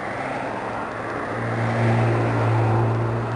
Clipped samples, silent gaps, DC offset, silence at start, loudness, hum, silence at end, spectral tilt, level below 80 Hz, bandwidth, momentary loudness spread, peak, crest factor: under 0.1%; none; under 0.1%; 0 s; -23 LUFS; none; 0 s; -8 dB/octave; -48 dBFS; 10 kHz; 8 LU; -8 dBFS; 14 dB